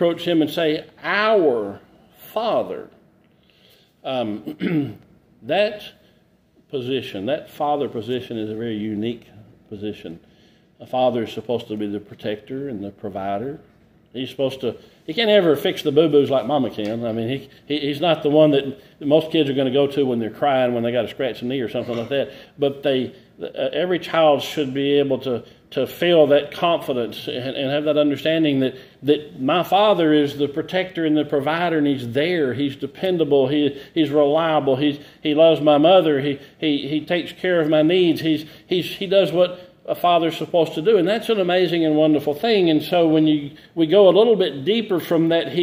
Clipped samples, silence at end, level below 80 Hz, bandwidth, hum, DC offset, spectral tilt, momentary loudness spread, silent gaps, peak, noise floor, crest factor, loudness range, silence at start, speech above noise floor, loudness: under 0.1%; 0 s; -62 dBFS; 16 kHz; none; under 0.1%; -6.5 dB/octave; 13 LU; none; -2 dBFS; -58 dBFS; 18 dB; 9 LU; 0 s; 38 dB; -20 LUFS